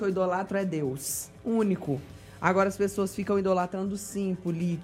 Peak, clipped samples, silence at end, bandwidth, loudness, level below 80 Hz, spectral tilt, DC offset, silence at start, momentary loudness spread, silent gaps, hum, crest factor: -8 dBFS; under 0.1%; 0 s; 16 kHz; -29 LUFS; -58 dBFS; -6 dB/octave; under 0.1%; 0 s; 7 LU; none; none; 22 dB